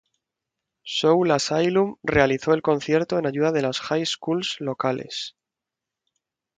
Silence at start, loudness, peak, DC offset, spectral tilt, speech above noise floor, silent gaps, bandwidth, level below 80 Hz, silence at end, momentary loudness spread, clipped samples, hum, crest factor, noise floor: 0.85 s; -23 LUFS; -4 dBFS; under 0.1%; -5 dB/octave; 65 dB; none; 9.4 kHz; -52 dBFS; 1.3 s; 9 LU; under 0.1%; none; 20 dB; -87 dBFS